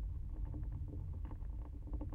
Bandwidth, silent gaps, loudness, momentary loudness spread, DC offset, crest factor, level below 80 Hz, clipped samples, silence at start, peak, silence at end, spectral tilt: 3 kHz; none; -47 LUFS; 3 LU; under 0.1%; 10 dB; -44 dBFS; under 0.1%; 0 s; -32 dBFS; 0 s; -10.5 dB/octave